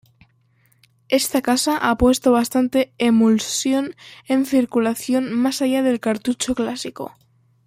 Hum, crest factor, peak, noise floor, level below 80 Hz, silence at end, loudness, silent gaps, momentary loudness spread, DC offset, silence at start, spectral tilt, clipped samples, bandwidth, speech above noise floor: none; 16 dB; -4 dBFS; -60 dBFS; -46 dBFS; 0.6 s; -19 LUFS; none; 9 LU; under 0.1%; 1.1 s; -4 dB/octave; under 0.1%; 16 kHz; 41 dB